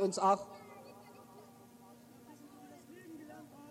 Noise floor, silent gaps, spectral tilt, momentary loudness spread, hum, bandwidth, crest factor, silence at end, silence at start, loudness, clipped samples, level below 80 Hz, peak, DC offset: -58 dBFS; none; -4.5 dB/octave; 26 LU; none; 16.5 kHz; 22 dB; 0.05 s; 0 s; -33 LUFS; under 0.1%; -82 dBFS; -18 dBFS; under 0.1%